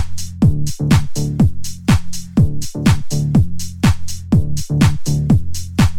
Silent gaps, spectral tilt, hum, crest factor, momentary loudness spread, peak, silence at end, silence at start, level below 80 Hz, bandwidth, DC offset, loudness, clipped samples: none; -6 dB/octave; none; 14 dB; 6 LU; 0 dBFS; 0 s; 0 s; -26 dBFS; 16.5 kHz; 0.5%; -17 LUFS; under 0.1%